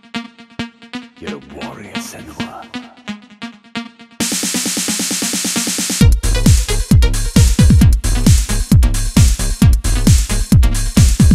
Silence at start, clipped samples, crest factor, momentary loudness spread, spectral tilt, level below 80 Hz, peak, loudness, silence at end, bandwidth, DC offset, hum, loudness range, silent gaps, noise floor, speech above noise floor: 0.15 s; under 0.1%; 14 dB; 18 LU; -4.5 dB/octave; -16 dBFS; 0 dBFS; -13 LUFS; 0 s; 16 kHz; under 0.1%; none; 16 LU; none; -33 dBFS; 6 dB